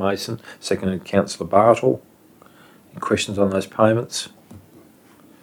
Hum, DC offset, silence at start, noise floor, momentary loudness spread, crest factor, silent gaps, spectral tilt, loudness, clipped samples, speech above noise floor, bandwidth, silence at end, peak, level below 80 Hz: none; under 0.1%; 0 s; -50 dBFS; 14 LU; 22 dB; none; -5 dB/octave; -21 LUFS; under 0.1%; 30 dB; 19 kHz; 0.85 s; 0 dBFS; -58 dBFS